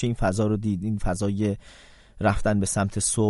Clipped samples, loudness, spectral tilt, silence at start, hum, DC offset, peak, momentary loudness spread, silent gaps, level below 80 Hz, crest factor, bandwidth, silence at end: under 0.1%; -25 LUFS; -5.5 dB/octave; 0 s; none; under 0.1%; -8 dBFS; 4 LU; none; -38 dBFS; 16 dB; 11.5 kHz; 0 s